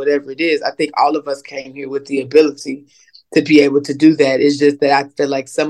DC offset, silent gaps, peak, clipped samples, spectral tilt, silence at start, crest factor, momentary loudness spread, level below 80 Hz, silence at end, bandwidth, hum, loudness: under 0.1%; none; 0 dBFS; under 0.1%; -5 dB/octave; 0 s; 14 dB; 14 LU; -66 dBFS; 0 s; 11 kHz; none; -15 LUFS